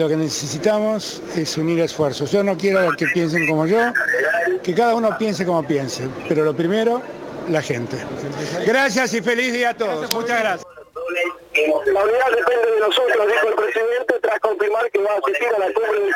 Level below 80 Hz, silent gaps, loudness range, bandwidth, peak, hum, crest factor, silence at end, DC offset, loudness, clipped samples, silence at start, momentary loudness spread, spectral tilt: -60 dBFS; none; 3 LU; 17 kHz; 0 dBFS; none; 20 dB; 0 s; under 0.1%; -19 LUFS; under 0.1%; 0 s; 8 LU; -4.5 dB/octave